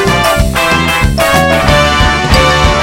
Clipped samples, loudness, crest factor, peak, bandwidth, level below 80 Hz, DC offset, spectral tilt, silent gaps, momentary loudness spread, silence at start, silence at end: 0.4%; -9 LUFS; 8 dB; 0 dBFS; 18.5 kHz; -16 dBFS; under 0.1%; -4.5 dB/octave; none; 2 LU; 0 s; 0 s